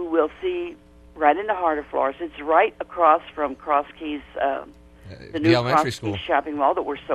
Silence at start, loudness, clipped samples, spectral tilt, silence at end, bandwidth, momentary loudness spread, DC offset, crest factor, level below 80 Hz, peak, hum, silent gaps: 0 s; -22 LUFS; under 0.1%; -6 dB/octave; 0 s; 13.5 kHz; 13 LU; under 0.1%; 20 dB; -52 dBFS; -2 dBFS; none; none